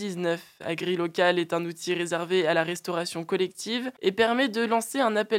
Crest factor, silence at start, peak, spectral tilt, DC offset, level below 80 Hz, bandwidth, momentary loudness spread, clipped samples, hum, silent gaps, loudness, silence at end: 20 dB; 0 s; -6 dBFS; -4 dB/octave; under 0.1%; -76 dBFS; 16.5 kHz; 7 LU; under 0.1%; none; none; -27 LUFS; 0 s